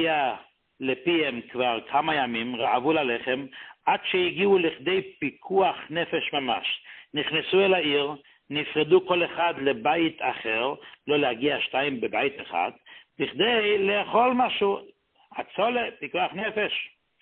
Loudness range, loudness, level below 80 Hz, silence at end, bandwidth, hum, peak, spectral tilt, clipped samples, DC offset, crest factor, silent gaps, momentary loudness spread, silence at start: 2 LU; -25 LUFS; -66 dBFS; 0.35 s; 4.3 kHz; none; -8 dBFS; -9 dB/octave; under 0.1%; under 0.1%; 18 dB; none; 10 LU; 0 s